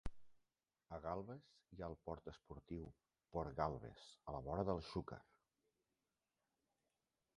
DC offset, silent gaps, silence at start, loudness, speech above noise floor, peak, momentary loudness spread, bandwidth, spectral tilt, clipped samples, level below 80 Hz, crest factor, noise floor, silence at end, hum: under 0.1%; none; 0.05 s; -49 LUFS; over 42 dB; -24 dBFS; 15 LU; 11 kHz; -7.5 dB/octave; under 0.1%; -62 dBFS; 26 dB; under -90 dBFS; 2.15 s; none